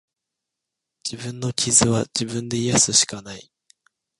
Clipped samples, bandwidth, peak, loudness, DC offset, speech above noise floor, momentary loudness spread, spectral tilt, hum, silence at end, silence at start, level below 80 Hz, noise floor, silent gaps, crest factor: under 0.1%; 11.5 kHz; -2 dBFS; -19 LUFS; under 0.1%; 62 dB; 18 LU; -3 dB/octave; none; 0.75 s; 1.05 s; -52 dBFS; -84 dBFS; none; 22 dB